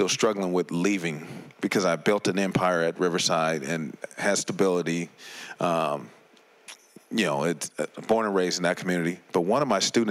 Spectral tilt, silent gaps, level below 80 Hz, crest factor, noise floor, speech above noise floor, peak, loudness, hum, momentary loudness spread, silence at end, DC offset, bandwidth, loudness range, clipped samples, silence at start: -4 dB/octave; none; -68 dBFS; 16 dB; -57 dBFS; 31 dB; -12 dBFS; -26 LUFS; none; 11 LU; 0 s; under 0.1%; 15.5 kHz; 4 LU; under 0.1%; 0 s